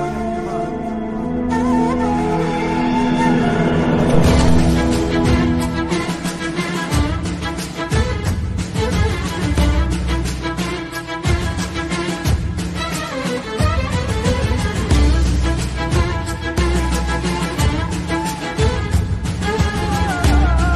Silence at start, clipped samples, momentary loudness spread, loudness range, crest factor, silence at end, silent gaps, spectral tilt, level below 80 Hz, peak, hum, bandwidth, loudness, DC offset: 0 s; under 0.1%; 7 LU; 5 LU; 16 dB; 0 s; none; -6 dB/octave; -22 dBFS; -2 dBFS; none; 12.5 kHz; -19 LUFS; under 0.1%